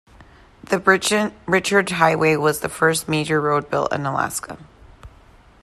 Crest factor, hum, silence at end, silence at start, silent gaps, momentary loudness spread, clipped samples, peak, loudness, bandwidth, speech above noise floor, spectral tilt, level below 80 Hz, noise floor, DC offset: 20 dB; none; 0.55 s; 0.7 s; none; 8 LU; under 0.1%; -2 dBFS; -19 LUFS; 14 kHz; 30 dB; -4 dB/octave; -52 dBFS; -49 dBFS; under 0.1%